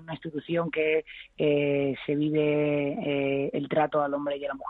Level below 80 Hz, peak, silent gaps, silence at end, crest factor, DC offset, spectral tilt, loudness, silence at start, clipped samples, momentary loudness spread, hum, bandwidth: -64 dBFS; -12 dBFS; none; 0 s; 14 dB; under 0.1%; -9.5 dB/octave; -27 LUFS; 0 s; under 0.1%; 6 LU; none; 4.1 kHz